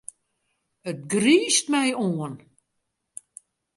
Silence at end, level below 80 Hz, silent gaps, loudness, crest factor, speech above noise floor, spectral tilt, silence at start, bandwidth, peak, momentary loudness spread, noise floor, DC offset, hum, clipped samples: 1.4 s; -70 dBFS; none; -22 LUFS; 20 dB; 56 dB; -3.5 dB/octave; 0.85 s; 11.5 kHz; -6 dBFS; 24 LU; -78 dBFS; under 0.1%; none; under 0.1%